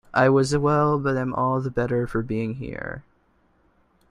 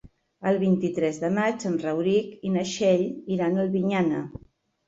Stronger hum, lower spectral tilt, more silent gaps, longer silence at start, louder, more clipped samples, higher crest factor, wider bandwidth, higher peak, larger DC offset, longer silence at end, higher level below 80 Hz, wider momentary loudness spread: neither; about the same, -7 dB/octave vs -6.5 dB/octave; neither; about the same, 0.15 s vs 0.05 s; about the same, -23 LUFS vs -25 LUFS; neither; about the same, 18 dB vs 16 dB; first, 11.5 kHz vs 7.8 kHz; first, -4 dBFS vs -10 dBFS; neither; first, 1.1 s vs 0.5 s; first, -48 dBFS vs -60 dBFS; first, 14 LU vs 6 LU